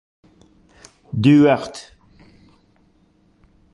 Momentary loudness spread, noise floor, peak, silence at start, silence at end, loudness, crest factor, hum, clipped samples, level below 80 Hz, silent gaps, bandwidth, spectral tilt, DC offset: 21 LU; -58 dBFS; -2 dBFS; 1.15 s; 1.95 s; -16 LUFS; 18 dB; none; under 0.1%; -54 dBFS; none; 11 kHz; -7.5 dB/octave; under 0.1%